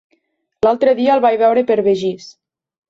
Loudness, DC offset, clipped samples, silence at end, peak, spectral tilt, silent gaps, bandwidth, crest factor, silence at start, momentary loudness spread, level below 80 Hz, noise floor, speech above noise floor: -15 LUFS; under 0.1%; under 0.1%; 0.6 s; -2 dBFS; -6 dB/octave; none; 7.8 kHz; 14 dB; 0.65 s; 7 LU; -56 dBFS; -65 dBFS; 51 dB